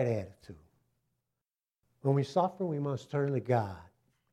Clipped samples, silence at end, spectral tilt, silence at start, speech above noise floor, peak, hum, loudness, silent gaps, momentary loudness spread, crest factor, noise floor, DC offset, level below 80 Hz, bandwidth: under 0.1%; 0.5 s; -8 dB/octave; 0 s; over 58 dB; -14 dBFS; none; -32 LUFS; none; 11 LU; 20 dB; under -90 dBFS; under 0.1%; -70 dBFS; 9.2 kHz